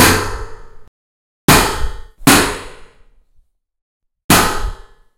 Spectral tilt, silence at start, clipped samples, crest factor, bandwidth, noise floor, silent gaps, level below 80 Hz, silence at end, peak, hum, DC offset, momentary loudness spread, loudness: -3 dB/octave; 0 s; 0.2%; 16 dB; over 20 kHz; -54 dBFS; 0.88-1.48 s, 3.82-4.00 s, 4.24-4.29 s; -28 dBFS; 0.4 s; 0 dBFS; none; under 0.1%; 19 LU; -13 LUFS